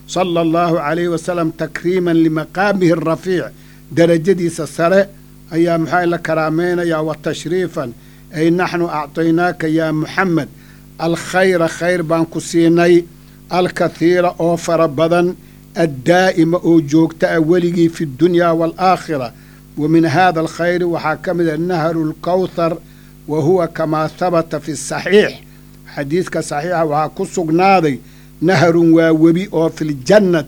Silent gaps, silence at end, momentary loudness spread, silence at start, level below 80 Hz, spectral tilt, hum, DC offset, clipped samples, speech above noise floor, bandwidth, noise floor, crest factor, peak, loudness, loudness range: none; 0 s; 9 LU; 0.1 s; -46 dBFS; -6 dB/octave; none; under 0.1%; under 0.1%; 24 dB; 19 kHz; -39 dBFS; 14 dB; 0 dBFS; -15 LUFS; 4 LU